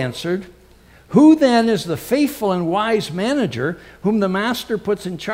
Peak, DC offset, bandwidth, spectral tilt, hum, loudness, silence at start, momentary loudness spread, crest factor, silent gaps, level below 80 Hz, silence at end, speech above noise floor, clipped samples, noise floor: -2 dBFS; under 0.1%; 16 kHz; -6 dB/octave; none; -18 LUFS; 0 s; 12 LU; 16 dB; none; -52 dBFS; 0 s; 30 dB; under 0.1%; -48 dBFS